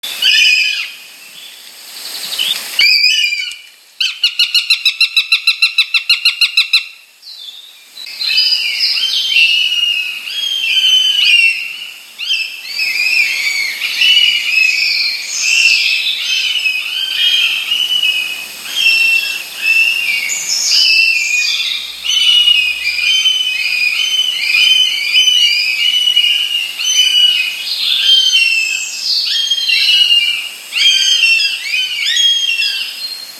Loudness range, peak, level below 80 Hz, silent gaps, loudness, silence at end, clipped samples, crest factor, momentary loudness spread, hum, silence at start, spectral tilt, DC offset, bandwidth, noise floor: 3 LU; 0 dBFS; -64 dBFS; none; -10 LUFS; 0 s; under 0.1%; 14 dB; 11 LU; none; 0.05 s; 4.5 dB/octave; under 0.1%; 18.5 kHz; -36 dBFS